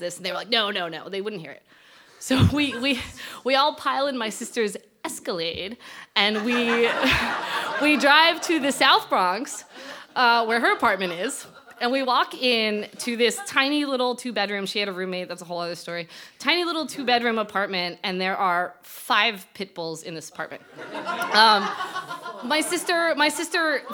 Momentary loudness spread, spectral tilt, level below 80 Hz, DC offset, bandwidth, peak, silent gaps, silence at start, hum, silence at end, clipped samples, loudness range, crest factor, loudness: 15 LU; -3.5 dB/octave; -54 dBFS; under 0.1%; 19.5 kHz; 0 dBFS; none; 0 s; none; 0 s; under 0.1%; 6 LU; 24 dB; -22 LUFS